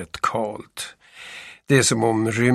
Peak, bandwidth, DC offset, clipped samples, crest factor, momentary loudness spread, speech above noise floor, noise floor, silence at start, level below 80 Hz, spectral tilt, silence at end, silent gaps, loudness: -2 dBFS; 15 kHz; under 0.1%; under 0.1%; 20 dB; 20 LU; 20 dB; -41 dBFS; 0 s; -56 dBFS; -4.5 dB/octave; 0 s; none; -20 LUFS